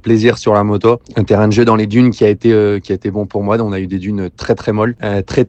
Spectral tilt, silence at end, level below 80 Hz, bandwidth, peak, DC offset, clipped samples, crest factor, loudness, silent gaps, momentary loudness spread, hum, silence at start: -7.5 dB/octave; 0.05 s; -42 dBFS; 8.4 kHz; 0 dBFS; under 0.1%; 0.3%; 12 dB; -13 LUFS; none; 8 LU; none; 0.05 s